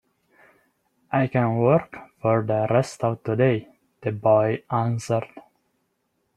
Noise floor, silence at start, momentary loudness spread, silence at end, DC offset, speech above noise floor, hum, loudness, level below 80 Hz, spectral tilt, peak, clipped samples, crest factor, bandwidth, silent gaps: -73 dBFS; 1.1 s; 9 LU; 0.95 s; under 0.1%; 51 dB; none; -23 LUFS; -62 dBFS; -7.5 dB/octave; -4 dBFS; under 0.1%; 20 dB; 11.5 kHz; none